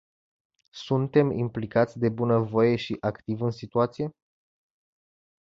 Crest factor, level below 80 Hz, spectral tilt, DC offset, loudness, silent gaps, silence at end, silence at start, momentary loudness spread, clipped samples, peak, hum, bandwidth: 20 dB; -60 dBFS; -8 dB/octave; under 0.1%; -26 LUFS; none; 1.35 s; 0.75 s; 7 LU; under 0.1%; -8 dBFS; none; 7.4 kHz